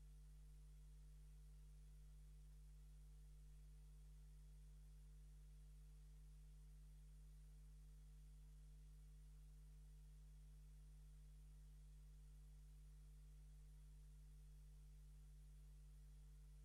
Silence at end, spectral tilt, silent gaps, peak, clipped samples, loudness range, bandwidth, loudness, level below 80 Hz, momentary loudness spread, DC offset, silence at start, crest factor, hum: 0 s; -6 dB/octave; none; -56 dBFS; under 0.1%; 0 LU; 12.5 kHz; -66 LUFS; -62 dBFS; 0 LU; under 0.1%; 0 s; 6 dB; 50 Hz at -60 dBFS